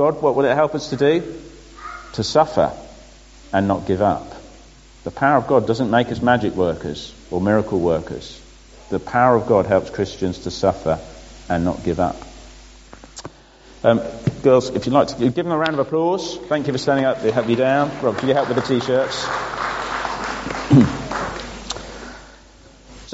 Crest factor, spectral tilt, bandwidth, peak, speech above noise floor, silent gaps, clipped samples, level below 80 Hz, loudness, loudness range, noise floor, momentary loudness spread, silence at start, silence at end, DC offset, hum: 20 dB; -5 dB/octave; 8 kHz; 0 dBFS; 27 dB; none; under 0.1%; -44 dBFS; -19 LUFS; 3 LU; -46 dBFS; 18 LU; 0 s; 0 s; under 0.1%; none